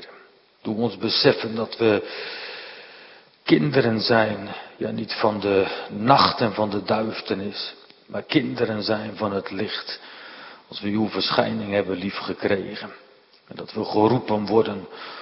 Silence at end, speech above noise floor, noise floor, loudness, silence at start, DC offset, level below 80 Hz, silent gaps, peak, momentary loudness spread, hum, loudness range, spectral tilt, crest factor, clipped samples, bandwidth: 0 s; 29 dB; -52 dBFS; -23 LUFS; 0 s; under 0.1%; -62 dBFS; none; 0 dBFS; 17 LU; none; 5 LU; -9.5 dB/octave; 24 dB; under 0.1%; 5.8 kHz